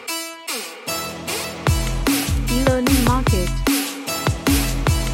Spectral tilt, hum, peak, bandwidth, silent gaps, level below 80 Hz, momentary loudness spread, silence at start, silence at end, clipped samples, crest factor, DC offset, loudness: -4.5 dB/octave; none; -2 dBFS; 17 kHz; none; -26 dBFS; 10 LU; 0 s; 0 s; under 0.1%; 18 dB; under 0.1%; -20 LUFS